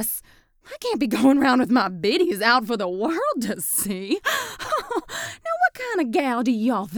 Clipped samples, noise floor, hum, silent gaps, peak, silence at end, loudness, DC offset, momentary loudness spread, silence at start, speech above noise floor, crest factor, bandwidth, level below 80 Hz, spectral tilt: under 0.1%; -52 dBFS; none; none; -4 dBFS; 0 s; -22 LUFS; under 0.1%; 10 LU; 0 s; 31 dB; 18 dB; over 20 kHz; -58 dBFS; -3.5 dB/octave